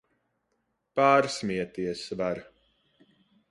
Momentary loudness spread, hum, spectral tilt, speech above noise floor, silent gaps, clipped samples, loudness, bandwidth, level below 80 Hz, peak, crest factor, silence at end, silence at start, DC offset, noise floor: 12 LU; none; -5 dB/octave; 51 dB; none; under 0.1%; -27 LUFS; 11.5 kHz; -64 dBFS; -8 dBFS; 22 dB; 1.05 s; 0.95 s; under 0.1%; -77 dBFS